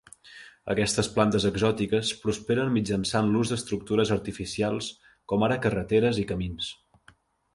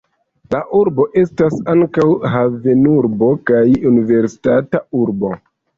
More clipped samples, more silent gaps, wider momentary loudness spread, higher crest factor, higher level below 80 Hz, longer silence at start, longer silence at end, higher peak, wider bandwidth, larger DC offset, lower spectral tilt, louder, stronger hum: neither; neither; about the same, 9 LU vs 7 LU; first, 20 dB vs 12 dB; about the same, -50 dBFS vs -48 dBFS; second, 0.25 s vs 0.5 s; first, 0.8 s vs 0.4 s; second, -6 dBFS vs -2 dBFS; first, 11.5 kHz vs 7.4 kHz; neither; second, -5 dB/octave vs -9 dB/octave; second, -26 LUFS vs -14 LUFS; neither